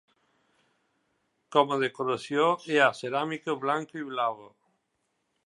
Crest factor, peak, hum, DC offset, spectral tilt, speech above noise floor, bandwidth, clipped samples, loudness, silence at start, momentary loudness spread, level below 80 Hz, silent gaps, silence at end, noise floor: 22 dB; -8 dBFS; none; under 0.1%; -4.5 dB/octave; 50 dB; 11.5 kHz; under 0.1%; -27 LUFS; 1.5 s; 8 LU; -82 dBFS; none; 1 s; -78 dBFS